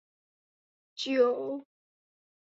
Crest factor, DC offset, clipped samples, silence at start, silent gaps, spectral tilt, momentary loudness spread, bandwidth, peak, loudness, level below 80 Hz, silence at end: 20 dB; under 0.1%; under 0.1%; 0.95 s; none; -3.5 dB/octave; 16 LU; 7.8 kHz; -14 dBFS; -29 LUFS; -82 dBFS; 0.8 s